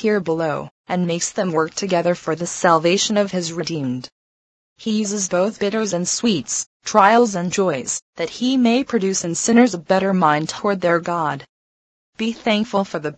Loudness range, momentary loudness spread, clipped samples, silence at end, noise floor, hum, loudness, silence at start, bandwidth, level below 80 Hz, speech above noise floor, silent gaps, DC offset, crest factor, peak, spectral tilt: 4 LU; 10 LU; under 0.1%; 0.05 s; under -90 dBFS; none; -19 LUFS; 0 s; 9.2 kHz; -60 dBFS; over 71 dB; 0.71-0.84 s, 4.12-4.76 s, 6.66-6.80 s, 8.02-8.13 s, 11.49-12.13 s; under 0.1%; 20 dB; 0 dBFS; -4 dB/octave